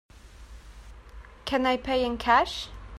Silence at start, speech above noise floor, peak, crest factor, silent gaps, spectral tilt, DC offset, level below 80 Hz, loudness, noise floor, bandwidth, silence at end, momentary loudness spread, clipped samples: 0.15 s; 22 dB; -8 dBFS; 20 dB; none; -4 dB/octave; under 0.1%; -46 dBFS; -26 LUFS; -47 dBFS; 14 kHz; 0 s; 12 LU; under 0.1%